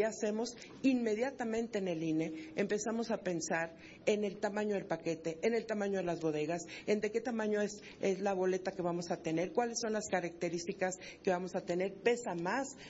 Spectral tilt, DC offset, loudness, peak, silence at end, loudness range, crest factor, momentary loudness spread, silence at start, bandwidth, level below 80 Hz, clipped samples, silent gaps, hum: -5 dB/octave; under 0.1%; -36 LUFS; -16 dBFS; 0 s; 1 LU; 20 dB; 5 LU; 0 s; 8 kHz; -70 dBFS; under 0.1%; none; none